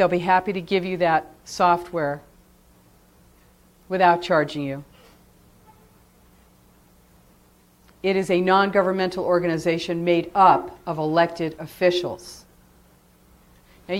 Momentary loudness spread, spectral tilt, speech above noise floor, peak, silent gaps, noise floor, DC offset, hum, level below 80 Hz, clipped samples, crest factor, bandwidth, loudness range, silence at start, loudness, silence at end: 13 LU; -6 dB/octave; 35 dB; -2 dBFS; none; -56 dBFS; under 0.1%; none; -56 dBFS; under 0.1%; 22 dB; 16.5 kHz; 7 LU; 0 s; -21 LUFS; 0 s